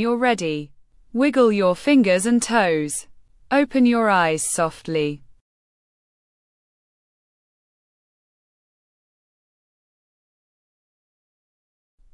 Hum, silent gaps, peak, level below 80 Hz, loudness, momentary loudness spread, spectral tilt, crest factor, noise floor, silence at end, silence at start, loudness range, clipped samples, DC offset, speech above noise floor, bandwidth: none; none; -4 dBFS; -58 dBFS; -19 LUFS; 11 LU; -4.5 dB/octave; 18 dB; under -90 dBFS; 6.95 s; 0 s; 11 LU; under 0.1%; under 0.1%; over 71 dB; 12 kHz